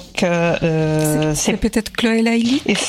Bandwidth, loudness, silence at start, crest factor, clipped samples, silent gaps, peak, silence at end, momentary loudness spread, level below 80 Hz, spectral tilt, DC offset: 16 kHz; -17 LUFS; 0 s; 12 dB; under 0.1%; none; -4 dBFS; 0 s; 3 LU; -38 dBFS; -4.5 dB/octave; under 0.1%